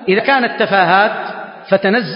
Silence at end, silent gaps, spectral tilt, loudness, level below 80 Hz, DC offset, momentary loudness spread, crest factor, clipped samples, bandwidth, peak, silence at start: 0 s; none; -10 dB/octave; -13 LUFS; -62 dBFS; under 0.1%; 13 LU; 14 dB; under 0.1%; 5.4 kHz; 0 dBFS; 0 s